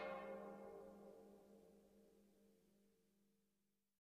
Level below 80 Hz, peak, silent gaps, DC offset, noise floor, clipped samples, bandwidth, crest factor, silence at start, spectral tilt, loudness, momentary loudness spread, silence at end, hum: -86 dBFS; -40 dBFS; none; under 0.1%; -89 dBFS; under 0.1%; 15 kHz; 20 dB; 0 s; -6 dB/octave; -57 LUFS; 16 LU; 0.75 s; 50 Hz at -75 dBFS